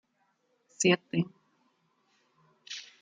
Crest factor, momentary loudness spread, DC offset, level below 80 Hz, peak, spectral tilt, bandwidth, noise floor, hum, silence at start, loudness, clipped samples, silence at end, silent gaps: 22 dB; 16 LU; under 0.1%; -76 dBFS; -12 dBFS; -4 dB/octave; 9.6 kHz; -74 dBFS; none; 0.8 s; -29 LUFS; under 0.1%; 0.15 s; none